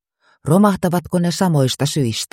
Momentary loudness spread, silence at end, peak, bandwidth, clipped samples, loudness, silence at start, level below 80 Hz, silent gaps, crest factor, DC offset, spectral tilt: 5 LU; 0.1 s; -2 dBFS; 16.5 kHz; under 0.1%; -17 LUFS; 0.45 s; -50 dBFS; none; 16 dB; under 0.1%; -5.5 dB/octave